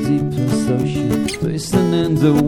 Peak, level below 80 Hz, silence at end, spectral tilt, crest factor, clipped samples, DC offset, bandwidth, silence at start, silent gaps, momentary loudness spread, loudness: -2 dBFS; -40 dBFS; 0 s; -6.5 dB/octave; 14 dB; under 0.1%; 0.5%; 17.5 kHz; 0 s; none; 4 LU; -18 LUFS